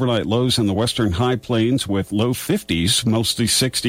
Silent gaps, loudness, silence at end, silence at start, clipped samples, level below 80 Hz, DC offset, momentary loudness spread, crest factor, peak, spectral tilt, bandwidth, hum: none; -19 LUFS; 0 s; 0 s; under 0.1%; -42 dBFS; under 0.1%; 4 LU; 12 dB; -6 dBFS; -4.5 dB/octave; 16 kHz; none